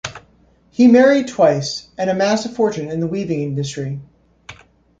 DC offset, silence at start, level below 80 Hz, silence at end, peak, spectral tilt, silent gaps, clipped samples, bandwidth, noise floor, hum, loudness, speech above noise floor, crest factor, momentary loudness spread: under 0.1%; 0.05 s; -54 dBFS; 0.45 s; -2 dBFS; -6 dB/octave; none; under 0.1%; 7.8 kHz; -54 dBFS; none; -17 LUFS; 38 dB; 16 dB; 16 LU